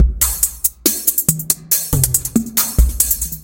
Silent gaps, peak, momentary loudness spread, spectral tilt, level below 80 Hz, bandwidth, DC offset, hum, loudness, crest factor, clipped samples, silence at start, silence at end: none; 0 dBFS; 2 LU; -3 dB/octave; -22 dBFS; over 20 kHz; under 0.1%; none; -15 LUFS; 16 dB; under 0.1%; 0 s; 0 s